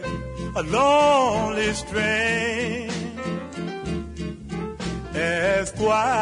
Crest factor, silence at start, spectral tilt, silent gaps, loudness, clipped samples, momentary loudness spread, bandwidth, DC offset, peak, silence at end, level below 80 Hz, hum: 14 dB; 0 s; -4.5 dB/octave; none; -23 LUFS; under 0.1%; 13 LU; 11 kHz; under 0.1%; -8 dBFS; 0 s; -42 dBFS; none